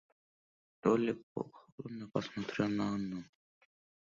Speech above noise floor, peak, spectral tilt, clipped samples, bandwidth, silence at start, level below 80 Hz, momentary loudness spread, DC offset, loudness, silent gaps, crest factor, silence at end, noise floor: over 54 dB; -14 dBFS; -6 dB/octave; under 0.1%; 7.4 kHz; 0.85 s; -72 dBFS; 15 LU; under 0.1%; -37 LUFS; 1.23-1.35 s, 1.72-1.78 s; 24 dB; 0.9 s; under -90 dBFS